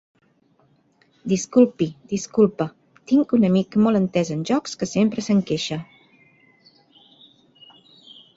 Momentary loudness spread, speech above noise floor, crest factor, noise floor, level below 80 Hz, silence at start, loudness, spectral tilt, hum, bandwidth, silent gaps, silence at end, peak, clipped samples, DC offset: 11 LU; 41 dB; 18 dB; -61 dBFS; -60 dBFS; 1.25 s; -21 LUFS; -6 dB/octave; none; 8 kHz; none; 2.55 s; -4 dBFS; under 0.1%; under 0.1%